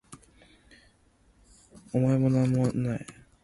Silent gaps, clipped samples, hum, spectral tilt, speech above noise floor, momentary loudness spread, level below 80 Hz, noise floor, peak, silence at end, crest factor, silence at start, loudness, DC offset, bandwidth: none; under 0.1%; none; -8.5 dB/octave; 38 dB; 11 LU; -58 dBFS; -63 dBFS; -12 dBFS; 0.3 s; 16 dB; 0.1 s; -27 LUFS; under 0.1%; 11.5 kHz